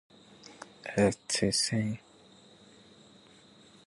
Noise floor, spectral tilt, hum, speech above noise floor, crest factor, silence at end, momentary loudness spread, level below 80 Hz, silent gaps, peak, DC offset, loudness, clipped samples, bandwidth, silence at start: -58 dBFS; -4 dB/octave; none; 29 dB; 20 dB; 1.9 s; 22 LU; -60 dBFS; none; -14 dBFS; under 0.1%; -30 LUFS; under 0.1%; 11.5 kHz; 0.45 s